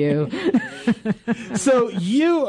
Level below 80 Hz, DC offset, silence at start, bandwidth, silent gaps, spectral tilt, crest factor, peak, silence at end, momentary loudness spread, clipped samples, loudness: -58 dBFS; under 0.1%; 0 s; 11.5 kHz; none; -6 dB/octave; 12 dB; -8 dBFS; 0 s; 6 LU; under 0.1%; -21 LUFS